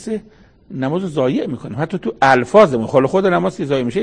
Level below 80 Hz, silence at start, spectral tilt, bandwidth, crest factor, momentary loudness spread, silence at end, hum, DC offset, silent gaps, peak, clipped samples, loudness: -52 dBFS; 0 s; -6.5 dB/octave; 9.8 kHz; 16 dB; 13 LU; 0 s; none; under 0.1%; none; 0 dBFS; under 0.1%; -16 LUFS